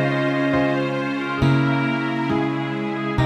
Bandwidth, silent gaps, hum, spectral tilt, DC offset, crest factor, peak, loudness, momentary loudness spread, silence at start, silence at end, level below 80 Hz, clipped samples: 8.8 kHz; none; none; -7.5 dB/octave; under 0.1%; 14 dB; -6 dBFS; -21 LUFS; 5 LU; 0 s; 0 s; -42 dBFS; under 0.1%